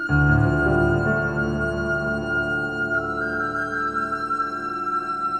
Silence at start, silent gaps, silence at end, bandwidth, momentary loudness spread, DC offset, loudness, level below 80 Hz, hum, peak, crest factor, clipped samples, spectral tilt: 0 s; none; 0 s; 9 kHz; 6 LU; 0.1%; -23 LUFS; -36 dBFS; none; -6 dBFS; 16 dB; under 0.1%; -7.5 dB/octave